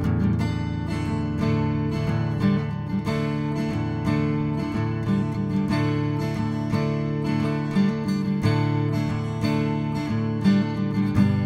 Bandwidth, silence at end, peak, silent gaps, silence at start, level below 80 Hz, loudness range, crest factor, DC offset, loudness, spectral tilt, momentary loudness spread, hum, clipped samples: 11.5 kHz; 0 s; -8 dBFS; none; 0 s; -42 dBFS; 1 LU; 16 dB; under 0.1%; -24 LUFS; -8 dB/octave; 4 LU; none; under 0.1%